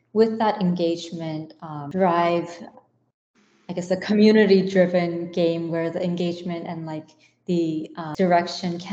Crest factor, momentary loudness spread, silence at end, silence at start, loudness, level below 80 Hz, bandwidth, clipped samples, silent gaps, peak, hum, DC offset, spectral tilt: 18 dB; 16 LU; 0 s; 0.15 s; -22 LUFS; -68 dBFS; 8 kHz; under 0.1%; 3.14-3.34 s; -4 dBFS; none; under 0.1%; -7 dB/octave